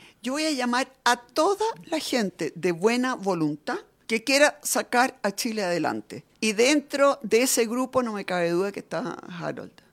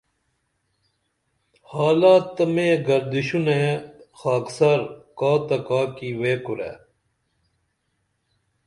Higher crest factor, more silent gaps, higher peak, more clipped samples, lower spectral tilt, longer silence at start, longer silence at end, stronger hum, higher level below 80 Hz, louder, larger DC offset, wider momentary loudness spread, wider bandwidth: about the same, 20 dB vs 18 dB; neither; about the same, -6 dBFS vs -4 dBFS; neither; second, -3 dB/octave vs -6.5 dB/octave; second, 0.25 s vs 1.7 s; second, 0.25 s vs 1.9 s; neither; second, -70 dBFS vs -64 dBFS; second, -25 LUFS vs -21 LUFS; neither; about the same, 12 LU vs 13 LU; first, 16.5 kHz vs 11.5 kHz